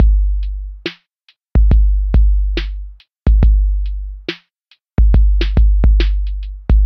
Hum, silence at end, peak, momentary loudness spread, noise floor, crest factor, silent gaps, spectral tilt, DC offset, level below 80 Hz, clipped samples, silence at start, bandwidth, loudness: none; 0 s; 0 dBFS; 14 LU; -57 dBFS; 12 dB; none; -8.5 dB/octave; under 0.1%; -14 dBFS; under 0.1%; 0 s; 5.4 kHz; -16 LUFS